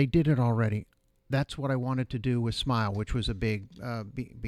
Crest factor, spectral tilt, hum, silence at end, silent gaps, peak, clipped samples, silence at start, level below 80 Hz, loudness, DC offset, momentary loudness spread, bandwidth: 18 dB; -7 dB/octave; none; 0 s; none; -12 dBFS; under 0.1%; 0 s; -44 dBFS; -30 LUFS; under 0.1%; 11 LU; 12 kHz